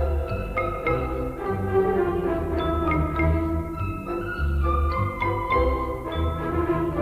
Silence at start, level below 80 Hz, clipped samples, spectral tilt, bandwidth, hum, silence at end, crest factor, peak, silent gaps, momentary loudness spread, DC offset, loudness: 0 s; -30 dBFS; under 0.1%; -8.5 dB/octave; 15 kHz; none; 0 s; 14 dB; -10 dBFS; none; 6 LU; under 0.1%; -25 LUFS